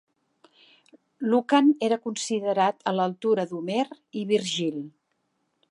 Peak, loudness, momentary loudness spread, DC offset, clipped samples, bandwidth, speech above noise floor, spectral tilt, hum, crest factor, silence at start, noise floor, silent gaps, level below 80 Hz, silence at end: -8 dBFS; -25 LUFS; 11 LU; under 0.1%; under 0.1%; 11.5 kHz; 50 dB; -4.5 dB/octave; none; 20 dB; 1.2 s; -75 dBFS; none; -82 dBFS; 0.8 s